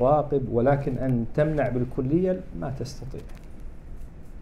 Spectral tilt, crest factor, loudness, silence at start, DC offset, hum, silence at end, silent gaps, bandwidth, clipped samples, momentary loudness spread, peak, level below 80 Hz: -9 dB/octave; 16 dB; -26 LUFS; 0 s; under 0.1%; none; 0 s; none; 11.5 kHz; under 0.1%; 22 LU; -10 dBFS; -38 dBFS